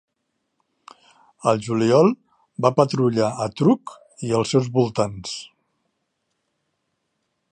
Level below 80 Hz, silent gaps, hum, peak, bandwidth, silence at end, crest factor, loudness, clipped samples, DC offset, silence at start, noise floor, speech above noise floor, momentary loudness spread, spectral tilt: -60 dBFS; none; none; -2 dBFS; 10.5 kHz; 2.05 s; 22 dB; -20 LUFS; under 0.1%; under 0.1%; 1.45 s; -75 dBFS; 56 dB; 16 LU; -6.5 dB/octave